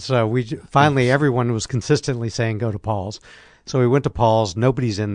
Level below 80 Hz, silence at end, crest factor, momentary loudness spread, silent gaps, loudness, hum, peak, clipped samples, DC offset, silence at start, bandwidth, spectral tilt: -46 dBFS; 0 s; 16 dB; 9 LU; none; -20 LUFS; none; -2 dBFS; under 0.1%; under 0.1%; 0 s; 10 kHz; -6 dB/octave